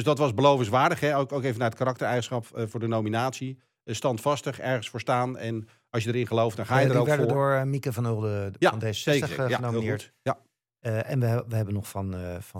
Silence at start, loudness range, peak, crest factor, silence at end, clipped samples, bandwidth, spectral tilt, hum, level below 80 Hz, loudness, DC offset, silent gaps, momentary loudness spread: 0 s; 4 LU; -8 dBFS; 20 dB; 0 s; under 0.1%; 16.5 kHz; -6 dB/octave; none; -66 dBFS; -27 LUFS; under 0.1%; none; 11 LU